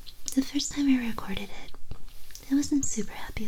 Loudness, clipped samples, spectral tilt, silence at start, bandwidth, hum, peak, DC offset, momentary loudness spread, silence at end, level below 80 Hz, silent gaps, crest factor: -29 LUFS; under 0.1%; -3.5 dB/octave; 0 s; 18.5 kHz; none; -10 dBFS; under 0.1%; 21 LU; 0 s; -44 dBFS; none; 18 dB